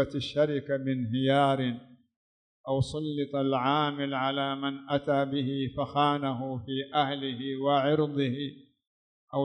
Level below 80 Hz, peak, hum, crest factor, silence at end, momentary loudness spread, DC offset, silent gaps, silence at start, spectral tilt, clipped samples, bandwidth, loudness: -62 dBFS; -12 dBFS; none; 16 dB; 0 s; 8 LU; under 0.1%; 2.16-2.64 s, 8.87-9.28 s; 0 s; -7 dB/octave; under 0.1%; 9.8 kHz; -29 LUFS